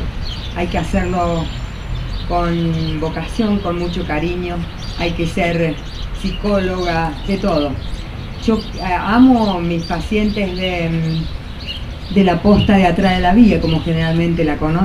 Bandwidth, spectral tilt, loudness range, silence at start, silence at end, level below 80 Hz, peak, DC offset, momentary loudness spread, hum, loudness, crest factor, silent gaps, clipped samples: 12 kHz; -7 dB/octave; 6 LU; 0 s; 0 s; -26 dBFS; 0 dBFS; 0.4%; 15 LU; none; -17 LUFS; 16 dB; none; under 0.1%